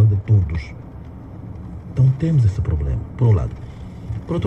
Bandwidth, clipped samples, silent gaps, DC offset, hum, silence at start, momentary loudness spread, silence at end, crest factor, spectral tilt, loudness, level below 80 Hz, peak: 6 kHz; under 0.1%; none; under 0.1%; none; 0 s; 19 LU; 0 s; 14 dB; -9.5 dB/octave; -19 LUFS; -32 dBFS; -6 dBFS